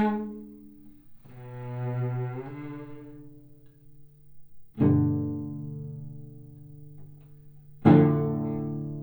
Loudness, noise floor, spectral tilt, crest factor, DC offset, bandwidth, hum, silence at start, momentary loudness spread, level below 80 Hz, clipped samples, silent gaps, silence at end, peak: -27 LUFS; -51 dBFS; -11 dB/octave; 22 dB; under 0.1%; over 20 kHz; none; 0 s; 27 LU; -60 dBFS; under 0.1%; none; 0 s; -6 dBFS